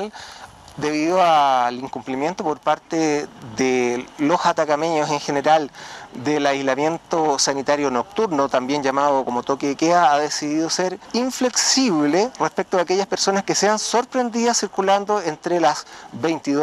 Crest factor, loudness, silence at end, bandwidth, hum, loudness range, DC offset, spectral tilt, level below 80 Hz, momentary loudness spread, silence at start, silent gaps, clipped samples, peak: 16 dB; -20 LUFS; 0 s; 13.5 kHz; none; 2 LU; under 0.1%; -3 dB/octave; -62 dBFS; 9 LU; 0 s; none; under 0.1%; -4 dBFS